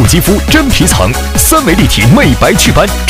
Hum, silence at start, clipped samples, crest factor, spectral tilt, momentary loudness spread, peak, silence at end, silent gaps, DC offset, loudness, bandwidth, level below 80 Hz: none; 0 s; 2%; 8 dB; -4 dB/octave; 3 LU; 0 dBFS; 0 s; none; under 0.1%; -7 LUFS; 18.5 kHz; -16 dBFS